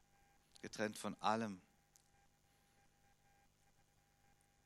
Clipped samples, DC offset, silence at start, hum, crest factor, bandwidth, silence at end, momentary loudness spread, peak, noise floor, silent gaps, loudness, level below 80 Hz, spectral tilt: under 0.1%; under 0.1%; 0.65 s; 50 Hz at -75 dBFS; 28 dB; 15.5 kHz; 3.05 s; 16 LU; -22 dBFS; -75 dBFS; none; -43 LUFS; -82 dBFS; -4.5 dB/octave